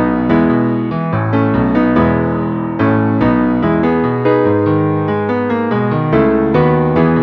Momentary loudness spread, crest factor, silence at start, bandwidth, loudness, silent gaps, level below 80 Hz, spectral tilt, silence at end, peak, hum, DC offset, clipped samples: 4 LU; 12 dB; 0 s; 5.4 kHz; -14 LUFS; none; -36 dBFS; -10.5 dB/octave; 0 s; 0 dBFS; none; under 0.1%; under 0.1%